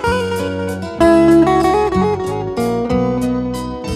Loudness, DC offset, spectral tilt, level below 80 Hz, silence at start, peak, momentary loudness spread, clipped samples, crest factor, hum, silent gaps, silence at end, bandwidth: -15 LUFS; under 0.1%; -6.5 dB/octave; -34 dBFS; 0 s; 0 dBFS; 11 LU; under 0.1%; 14 dB; none; none; 0 s; 14.5 kHz